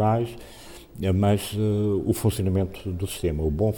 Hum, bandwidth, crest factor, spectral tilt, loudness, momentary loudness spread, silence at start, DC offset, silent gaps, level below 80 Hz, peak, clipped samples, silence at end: none; 18.5 kHz; 14 dB; -7 dB/octave; -25 LUFS; 17 LU; 0 s; under 0.1%; none; -40 dBFS; -10 dBFS; under 0.1%; 0 s